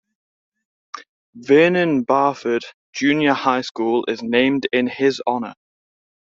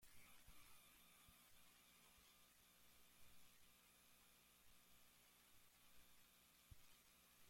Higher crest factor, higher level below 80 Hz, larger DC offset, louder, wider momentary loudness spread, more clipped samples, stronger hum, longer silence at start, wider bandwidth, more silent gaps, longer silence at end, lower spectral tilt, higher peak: about the same, 18 dB vs 18 dB; first, -64 dBFS vs -82 dBFS; neither; first, -18 LUFS vs -69 LUFS; first, 19 LU vs 2 LU; neither; second, none vs 60 Hz at -85 dBFS; first, 0.95 s vs 0 s; second, 7.6 kHz vs 16.5 kHz; first, 1.09-1.33 s, 2.74-2.93 s, 3.71-3.75 s vs none; first, 0.85 s vs 0 s; first, -5.5 dB/octave vs -2 dB/octave; first, -2 dBFS vs -52 dBFS